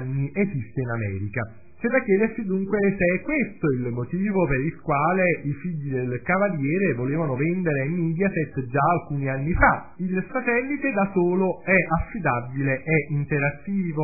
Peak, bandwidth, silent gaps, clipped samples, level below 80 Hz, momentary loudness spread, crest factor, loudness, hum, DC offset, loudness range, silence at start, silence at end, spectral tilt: -4 dBFS; 2.7 kHz; none; under 0.1%; -42 dBFS; 8 LU; 18 dB; -24 LUFS; none; 0.7%; 2 LU; 0 s; 0 s; -15 dB/octave